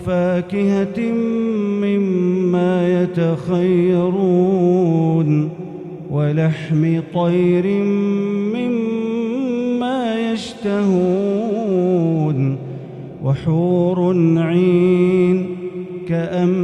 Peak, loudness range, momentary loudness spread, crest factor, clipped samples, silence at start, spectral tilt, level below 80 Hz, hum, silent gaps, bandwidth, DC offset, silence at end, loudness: -4 dBFS; 3 LU; 7 LU; 12 dB; under 0.1%; 0 s; -9 dB/octave; -54 dBFS; none; none; 8.8 kHz; under 0.1%; 0 s; -17 LUFS